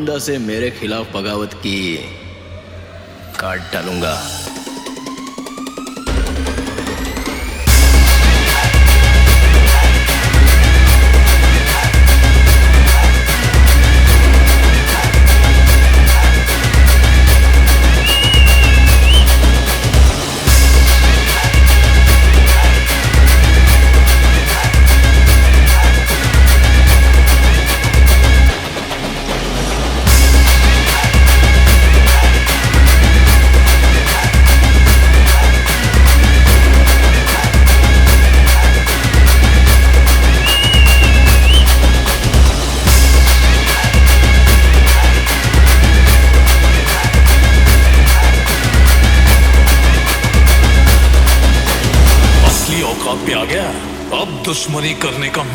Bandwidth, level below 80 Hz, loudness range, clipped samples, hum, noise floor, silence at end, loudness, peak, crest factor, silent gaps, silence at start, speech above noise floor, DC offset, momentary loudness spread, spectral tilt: over 20 kHz; -10 dBFS; 6 LU; under 0.1%; none; -33 dBFS; 0 s; -10 LUFS; 0 dBFS; 8 dB; none; 0 s; 13 dB; under 0.1%; 11 LU; -4 dB/octave